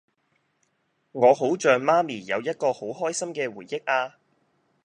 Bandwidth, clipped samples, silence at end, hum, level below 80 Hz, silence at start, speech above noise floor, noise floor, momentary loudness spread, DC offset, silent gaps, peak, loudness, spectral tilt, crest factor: 11 kHz; under 0.1%; 0.75 s; none; -78 dBFS; 1.15 s; 48 dB; -72 dBFS; 11 LU; under 0.1%; none; -4 dBFS; -24 LUFS; -4 dB/octave; 22 dB